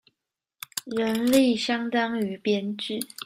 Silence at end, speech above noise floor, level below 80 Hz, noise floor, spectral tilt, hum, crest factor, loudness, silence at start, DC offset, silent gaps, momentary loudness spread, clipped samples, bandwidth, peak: 0 s; 59 dB; -66 dBFS; -84 dBFS; -4 dB/octave; none; 18 dB; -25 LUFS; 0.75 s; under 0.1%; none; 12 LU; under 0.1%; 16 kHz; -8 dBFS